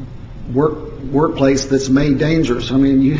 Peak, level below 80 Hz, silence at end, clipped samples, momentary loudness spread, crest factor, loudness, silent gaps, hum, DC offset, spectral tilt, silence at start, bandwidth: -2 dBFS; -32 dBFS; 0 s; under 0.1%; 10 LU; 14 dB; -16 LUFS; none; none; under 0.1%; -6.5 dB/octave; 0 s; 7.6 kHz